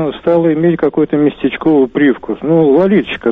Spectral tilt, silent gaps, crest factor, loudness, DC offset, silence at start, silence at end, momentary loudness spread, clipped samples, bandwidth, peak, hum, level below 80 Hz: -9.5 dB/octave; none; 10 dB; -12 LUFS; under 0.1%; 0 s; 0 s; 4 LU; under 0.1%; 4 kHz; -2 dBFS; none; -46 dBFS